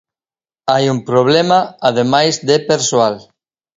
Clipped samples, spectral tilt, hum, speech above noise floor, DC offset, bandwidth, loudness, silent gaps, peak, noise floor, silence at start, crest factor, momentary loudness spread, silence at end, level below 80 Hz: under 0.1%; -4 dB/octave; none; over 77 dB; under 0.1%; 7.8 kHz; -14 LUFS; none; 0 dBFS; under -90 dBFS; 0.65 s; 14 dB; 5 LU; 0.55 s; -58 dBFS